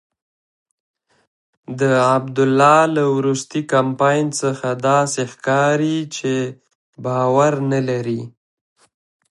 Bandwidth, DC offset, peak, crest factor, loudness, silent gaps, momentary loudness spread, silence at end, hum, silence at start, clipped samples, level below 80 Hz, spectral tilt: 11.5 kHz; under 0.1%; 0 dBFS; 18 dB; -17 LUFS; 6.75-6.93 s; 10 LU; 1 s; none; 1.7 s; under 0.1%; -66 dBFS; -5.5 dB/octave